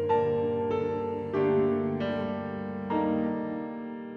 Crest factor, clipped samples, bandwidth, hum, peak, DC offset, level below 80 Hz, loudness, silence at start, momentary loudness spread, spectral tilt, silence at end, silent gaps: 14 dB; under 0.1%; 6.2 kHz; none; -14 dBFS; under 0.1%; -62 dBFS; -29 LUFS; 0 s; 9 LU; -9 dB/octave; 0 s; none